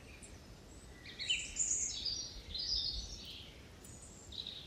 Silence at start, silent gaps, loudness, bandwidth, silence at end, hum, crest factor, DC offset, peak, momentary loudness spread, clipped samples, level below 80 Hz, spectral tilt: 0 s; none; -38 LUFS; 15 kHz; 0 s; none; 20 dB; under 0.1%; -22 dBFS; 20 LU; under 0.1%; -56 dBFS; 0 dB/octave